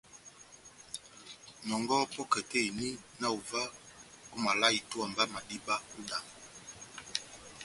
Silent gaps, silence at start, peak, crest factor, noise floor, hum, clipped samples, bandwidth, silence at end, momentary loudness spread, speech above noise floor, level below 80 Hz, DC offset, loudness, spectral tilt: none; 0.1 s; -12 dBFS; 24 dB; -56 dBFS; none; under 0.1%; 11.5 kHz; 0 s; 22 LU; 22 dB; -70 dBFS; under 0.1%; -34 LUFS; -2 dB/octave